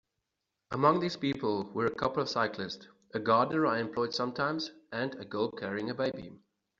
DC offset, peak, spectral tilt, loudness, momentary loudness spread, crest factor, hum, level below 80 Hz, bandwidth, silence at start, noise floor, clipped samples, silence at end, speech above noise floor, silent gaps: under 0.1%; -10 dBFS; -4 dB/octave; -32 LUFS; 13 LU; 22 dB; none; -68 dBFS; 7.6 kHz; 0.7 s; -85 dBFS; under 0.1%; 0.45 s; 54 dB; none